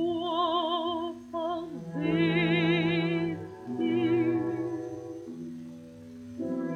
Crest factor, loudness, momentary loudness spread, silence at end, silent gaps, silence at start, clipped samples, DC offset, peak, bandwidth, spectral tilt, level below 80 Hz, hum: 16 dB; -29 LUFS; 16 LU; 0 s; none; 0 s; under 0.1%; under 0.1%; -14 dBFS; 6.8 kHz; -7.5 dB/octave; -64 dBFS; none